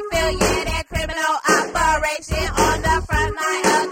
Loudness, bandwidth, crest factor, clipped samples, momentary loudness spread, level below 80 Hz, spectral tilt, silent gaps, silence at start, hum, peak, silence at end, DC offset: -19 LUFS; 16.5 kHz; 16 dB; under 0.1%; 6 LU; -30 dBFS; -3.5 dB/octave; none; 0 s; none; -4 dBFS; 0 s; under 0.1%